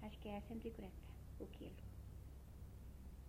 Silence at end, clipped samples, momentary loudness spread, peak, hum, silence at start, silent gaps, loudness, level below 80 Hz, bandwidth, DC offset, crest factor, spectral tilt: 0 s; under 0.1%; 8 LU; -36 dBFS; none; 0 s; none; -55 LUFS; -58 dBFS; 16 kHz; under 0.1%; 18 dB; -7 dB/octave